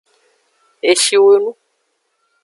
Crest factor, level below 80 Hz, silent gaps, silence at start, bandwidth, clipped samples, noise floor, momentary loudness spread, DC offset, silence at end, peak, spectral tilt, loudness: 16 dB; -68 dBFS; none; 0.85 s; 11.5 kHz; under 0.1%; -67 dBFS; 11 LU; under 0.1%; 0.9 s; 0 dBFS; -0.5 dB/octave; -13 LUFS